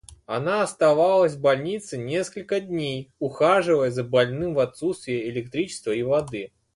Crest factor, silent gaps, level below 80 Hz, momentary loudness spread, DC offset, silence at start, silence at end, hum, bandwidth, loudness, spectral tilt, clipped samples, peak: 18 dB; none; -58 dBFS; 11 LU; under 0.1%; 0.1 s; 0.3 s; none; 11.5 kHz; -24 LUFS; -5.5 dB/octave; under 0.1%; -6 dBFS